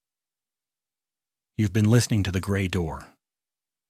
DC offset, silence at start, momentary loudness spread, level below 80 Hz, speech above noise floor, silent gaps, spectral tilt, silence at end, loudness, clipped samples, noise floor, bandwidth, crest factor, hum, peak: under 0.1%; 1.6 s; 15 LU; -52 dBFS; over 67 dB; none; -6 dB/octave; 0.85 s; -24 LUFS; under 0.1%; under -90 dBFS; 15 kHz; 20 dB; none; -6 dBFS